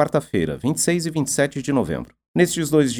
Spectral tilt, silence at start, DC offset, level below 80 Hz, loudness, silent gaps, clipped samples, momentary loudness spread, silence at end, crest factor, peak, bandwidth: -5 dB/octave; 0 s; under 0.1%; -48 dBFS; -21 LUFS; 2.28-2.34 s; under 0.1%; 7 LU; 0 s; 18 dB; -4 dBFS; 19.5 kHz